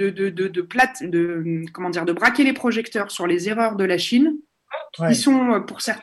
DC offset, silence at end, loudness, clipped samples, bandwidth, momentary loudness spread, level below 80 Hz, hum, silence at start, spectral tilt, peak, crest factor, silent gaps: under 0.1%; 0 s; -20 LUFS; under 0.1%; 13 kHz; 10 LU; -64 dBFS; none; 0 s; -4.5 dB/octave; -4 dBFS; 16 dB; none